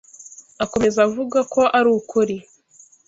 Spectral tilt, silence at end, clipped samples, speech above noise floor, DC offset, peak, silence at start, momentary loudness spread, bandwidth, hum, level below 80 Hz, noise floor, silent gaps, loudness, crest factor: -4.5 dB/octave; 0.65 s; under 0.1%; 34 dB; under 0.1%; -2 dBFS; 0.2 s; 21 LU; 8 kHz; none; -54 dBFS; -52 dBFS; none; -19 LUFS; 18 dB